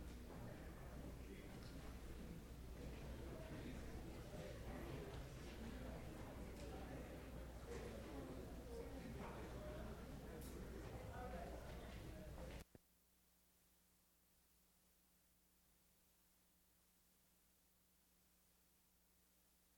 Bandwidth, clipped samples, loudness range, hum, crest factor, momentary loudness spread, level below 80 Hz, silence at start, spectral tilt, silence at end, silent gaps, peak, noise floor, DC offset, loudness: over 20 kHz; under 0.1%; 4 LU; none; 18 dB; 3 LU; -60 dBFS; 0 s; -6 dB/octave; 0 s; none; -38 dBFS; -78 dBFS; under 0.1%; -55 LUFS